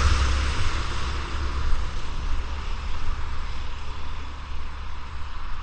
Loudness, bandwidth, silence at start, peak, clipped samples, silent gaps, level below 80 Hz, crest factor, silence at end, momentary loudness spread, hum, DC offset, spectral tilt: -31 LUFS; 9 kHz; 0 s; -8 dBFS; under 0.1%; none; -26 dBFS; 16 dB; 0 s; 12 LU; none; under 0.1%; -4.5 dB/octave